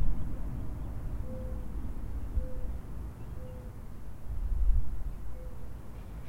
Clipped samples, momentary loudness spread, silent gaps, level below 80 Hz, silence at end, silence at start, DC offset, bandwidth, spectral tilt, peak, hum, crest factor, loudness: under 0.1%; 12 LU; none; -34 dBFS; 0 s; 0 s; under 0.1%; 11.5 kHz; -8.5 dB/octave; -12 dBFS; none; 18 dB; -40 LUFS